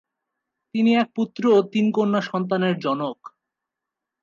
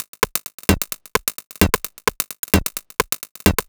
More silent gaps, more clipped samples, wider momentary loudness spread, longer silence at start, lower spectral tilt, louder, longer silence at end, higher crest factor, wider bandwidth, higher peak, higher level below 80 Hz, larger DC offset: second, none vs 0.08-0.13 s, 0.54-0.58 s, 1.46-1.50 s, 2.39-2.43 s, 3.31-3.35 s; neither; first, 10 LU vs 5 LU; first, 0.75 s vs 0 s; first, -7 dB/octave vs -3.5 dB/octave; about the same, -22 LUFS vs -21 LUFS; first, 0.95 s vs 0.05 s; second, 16 dB vs 22 dB; second, 7.2 kHz vs over 20 kHz; second, -6 dBFS vs 0 dBFS; second, -74 dBFS vs -32 dBFS; neither